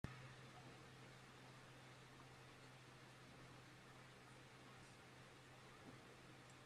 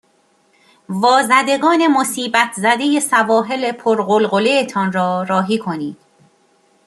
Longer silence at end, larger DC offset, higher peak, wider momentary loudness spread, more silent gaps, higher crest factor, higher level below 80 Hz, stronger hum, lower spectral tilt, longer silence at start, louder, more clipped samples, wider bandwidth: second, 0 s vs 0.95 s; neither; second, -32 dBFS vs -2 dBFS; second, 2 LU vs 7 LU; neither; first, 30 dB vs 16 dB; second, -78 dBFS vs -66 dBFS; neither; about the same, -4.5 dB/octave vs -4 dB/octave; second, 0.05 s vs 0.9 s; second, -62 LUFS vs -15 LUFS; neither; about the same, 13.5 kHz vs 13 kHz